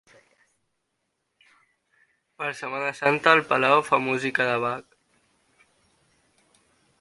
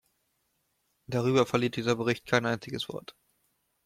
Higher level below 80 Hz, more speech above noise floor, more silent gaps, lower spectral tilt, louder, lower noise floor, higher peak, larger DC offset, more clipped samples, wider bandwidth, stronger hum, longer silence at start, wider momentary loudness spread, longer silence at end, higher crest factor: second, -72 dBFS vs -66 dBFS; first, 54 dB vs 47 dB; neither; about the same, -4.5 dB/octave vs -5.5 dB/octave; first, -23 LUFS vs -29 LUFS; about the same, -77 dBFS vs -76 dBFS; first, 0 dBFS vs -10 dBFS; neither; neither; second, 11.5 kHz vs 15.5 kHz; neither; first, 2.4 s vs 1.1 s; first, 13 LU vs 10 LU; first, 2.2 s vs 0.75 s; about the same, 26 dB vs 22 dB